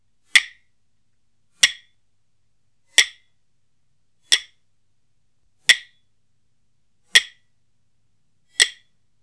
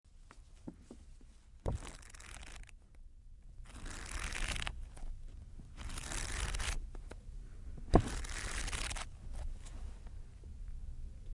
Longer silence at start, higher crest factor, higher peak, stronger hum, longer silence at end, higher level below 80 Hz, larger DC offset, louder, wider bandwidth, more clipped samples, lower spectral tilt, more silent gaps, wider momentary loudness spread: first, 0.35 s vs 0.05 s; second, 26 dB vs 32 dB; first, 0 dBFS vs -10 dBFS; neither; first, 0.5 s vs 0 s; second, -74 dBFS vs -44 dBFS; first, 0.1% vs under 0.1%; first, -18 LUFS vs -42 LUFS; about the same, 11 kHz vs 11.5 kHz; neither; second, 4 dB/octave vs -4 dB/octave; neither; second, 7 LU vs 21 LU